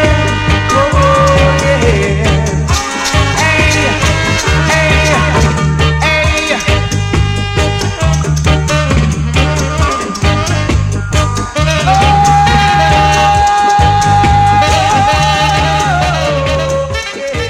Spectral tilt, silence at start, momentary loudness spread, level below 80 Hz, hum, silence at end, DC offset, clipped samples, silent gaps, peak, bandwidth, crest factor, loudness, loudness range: -4.5 dB/octave; 0 s; 5 LU; -18 dBFS; none; 0 s; under 0.1%; under 0.1%; none; 0 dBFS; 14.5 kHz; 10 dB; -10 LUFS; 4 LU